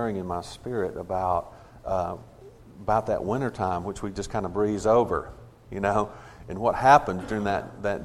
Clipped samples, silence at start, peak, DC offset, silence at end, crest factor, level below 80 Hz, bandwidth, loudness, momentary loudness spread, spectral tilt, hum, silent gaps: under 0.1%; 0 s; -4 dBFS; under 0.1%; 0 s; 24 dB; -48 dBFS; 13.5 kHz; -26 LUFS; 15 LU; -6 dB/octave; none; none